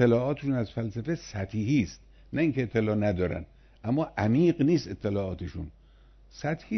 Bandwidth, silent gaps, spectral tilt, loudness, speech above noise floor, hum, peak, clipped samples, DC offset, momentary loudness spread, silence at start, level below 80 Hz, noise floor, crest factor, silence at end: 6.4 kHz; none; -7.5 dB/octave; -29 LUFS; 28 dB; none; -8 dBFS; under 0.1%; under 0.1%; 12 LU; 0 s; -50 dBFS; -55 dBFS; 20 dB; 0 s